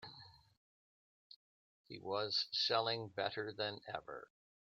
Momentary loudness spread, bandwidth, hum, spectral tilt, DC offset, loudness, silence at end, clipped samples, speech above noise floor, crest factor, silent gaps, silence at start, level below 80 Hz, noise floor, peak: 19 LU; 13 kHz; none; -3.5 dB/octave; under 0.1%; -39 LUFS; 0.4 s; under 0.1%; 19 dB; 22 dB; 0.57-1.30 s, 1.36-1.84 s; 0 s; -82 dBFS; -60 dBFS; -22 dBFS